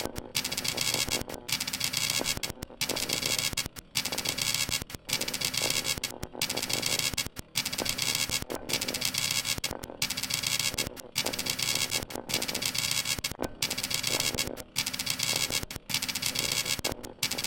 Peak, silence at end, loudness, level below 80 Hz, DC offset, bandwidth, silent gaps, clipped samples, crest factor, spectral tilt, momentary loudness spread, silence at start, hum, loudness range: -2 dBFS; 0 s; -29 LUFS; -52 dBFS; under 0.1%; 17 kHz; none; under 0.1%; 28 dB; -1 dB/octave; 6 LU; 0 s; none; 1 LU